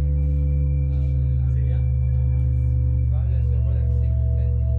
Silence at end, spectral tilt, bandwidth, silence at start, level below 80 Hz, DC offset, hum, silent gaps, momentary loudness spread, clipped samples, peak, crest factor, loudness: 0 s; -12 dB/octave; 2.5 kHz; 0 s; -22 dBFS; under 0.1%; none; none; 1 LU; under 0.1%; -12 dBFS; 8 dB; -22 LUFS